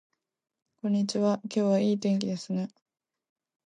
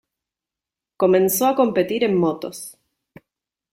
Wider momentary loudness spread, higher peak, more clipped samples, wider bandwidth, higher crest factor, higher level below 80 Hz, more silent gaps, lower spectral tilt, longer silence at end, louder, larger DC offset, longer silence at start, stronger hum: second, 8 LU vs 16 LU; second, -14 dBFS vs -4 dBFS; neither; second, 9.8 kHz vs 16.5 kHz; about the same, 16 dB vs 18 dB; second, -78 dBFS vs -64 dBFS; neither; first, -6.5 dB/octave vs -5 dB/octave; about the same, 1 s vs 1 s; second, -28 LUFS vs -19 LUFS; neither; second, 0.85 s vs 1 s; neither